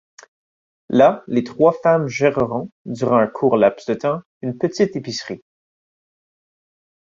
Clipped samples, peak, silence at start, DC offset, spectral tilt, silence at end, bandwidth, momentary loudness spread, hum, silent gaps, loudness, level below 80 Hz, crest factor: under 0.1%; -2 dBFS; 0.9 s; under 0.1%; -6.5 dB/octave; 1.85 s; 7.6 kHz; 13 LU; none; 2.72-2.85 s, 4.25-4.41 s; -19 LUFS; -58 dBFS; 18 dB